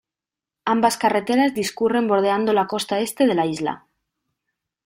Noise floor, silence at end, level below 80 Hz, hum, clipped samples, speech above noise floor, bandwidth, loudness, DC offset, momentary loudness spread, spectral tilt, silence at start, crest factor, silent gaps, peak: -89 dBFS; 1.1 s; -64 dBFS; none; under 0.1%; 69 dB; 16.5 kHz; -20 LUFS; under 0.1%; 7 LU; -4.5 dB/octave; 0.65 s; 16 dB; none; -4 dBFS